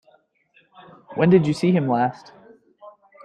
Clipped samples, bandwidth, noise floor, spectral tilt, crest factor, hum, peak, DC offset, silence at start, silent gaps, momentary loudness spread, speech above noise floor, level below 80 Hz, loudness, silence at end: under 0.1%; 10 kHz; -61 dBFS; -8 dB/octave; 18 dB; none; -4 dBFS; under 0.1%; 1.1 s; none; 8 LU; 42 dB; -62 dBFS; -19 LUFS; 0.35 s